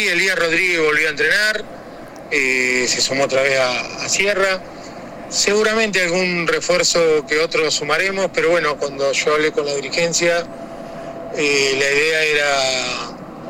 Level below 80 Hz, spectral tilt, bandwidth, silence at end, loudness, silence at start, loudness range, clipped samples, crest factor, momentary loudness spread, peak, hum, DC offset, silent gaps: -50 dBFS; -2 dB/octave; 16.5 kHz; 0 s; -16 LUFS; 0 s; 2 LU; under 0.1%; 18 dB; 16 LU; 0 dBFS; none; under 0.1%; none